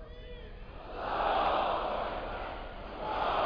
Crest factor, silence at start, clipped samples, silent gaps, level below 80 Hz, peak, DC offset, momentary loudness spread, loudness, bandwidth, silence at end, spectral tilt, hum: 16 dB; 0 s; under 0.1%; none; -46 dBFS; -18 dBFS; under 0.1%; 19 LU; -34 LUFS; 5.2 kHz; 0 s; -6.5 dB/octave; none